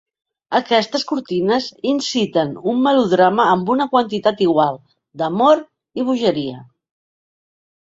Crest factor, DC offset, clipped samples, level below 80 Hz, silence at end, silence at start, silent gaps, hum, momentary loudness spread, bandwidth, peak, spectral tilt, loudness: 16 dB; under 0.1%; under 0.1%; -62 dBFS; 1.2 s; 0.5 s; none; none; 8 LU; 7.8 kHz; -2 dBFS; -5.5 dB/octave; -17 LUFS